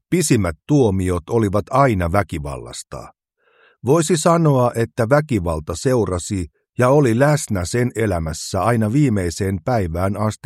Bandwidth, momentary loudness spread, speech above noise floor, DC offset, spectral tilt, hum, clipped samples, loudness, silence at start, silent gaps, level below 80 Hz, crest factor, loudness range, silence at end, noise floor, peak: 15 kHz; 12 LU; 40 dB; under 0.1%; -6 dB/octave; none; under 0.1%; -18 LUFS; 0.1 s; none; -40 dBFS; 18 dB; 2 LU; 0.1 s; -58 dBFS; 0 dBFS